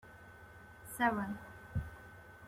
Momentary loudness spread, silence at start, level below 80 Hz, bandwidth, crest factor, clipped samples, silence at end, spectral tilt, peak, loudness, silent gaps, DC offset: 22 LU; 0.05 s; -56 dBFS; 16.5 kHz; 22 dB; under 0.1%; 0 s; -5.5 dB/octave; -18 dBFS; -39 LUFS; none; under 0.1%